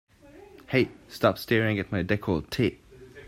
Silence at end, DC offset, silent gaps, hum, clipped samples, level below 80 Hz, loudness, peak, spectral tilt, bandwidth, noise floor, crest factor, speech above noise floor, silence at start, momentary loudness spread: 0 s; under 0.1%; none; none; under 0.1%; -54 dBFS; -27 LUFS; -8 dBFS; -6.5 dB/octave; 16 kHz; -51 dBFS; 20 dB; 25 dB; 0.35 s; 4 LU